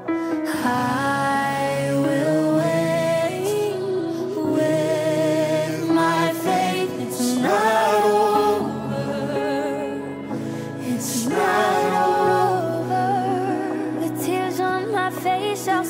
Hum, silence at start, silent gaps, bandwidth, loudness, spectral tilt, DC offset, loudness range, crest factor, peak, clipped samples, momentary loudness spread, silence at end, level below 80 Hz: none; 0 s; none; 16 kHz; -21 LUFS; -5 dB/octave; under 0.1%; 3 LU; 16 dB; -6 dBFS; under 0.1%; 7 LU; 0 s; -64 dBFS